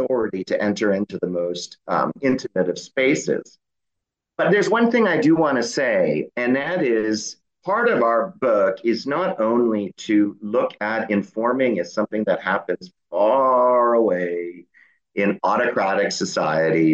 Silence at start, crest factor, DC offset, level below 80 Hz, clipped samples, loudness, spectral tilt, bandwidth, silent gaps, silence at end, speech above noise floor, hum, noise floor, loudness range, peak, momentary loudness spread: 0 s; 14 dB; under 0.1%; -68 dBFS; under 0.1%; -21 LUFS; -5.5 dB/octave; 8.4 kHz; none; 0 s; 62 dB; none; -82 dBFS; 3 LU; -6 dBFS; 8 LU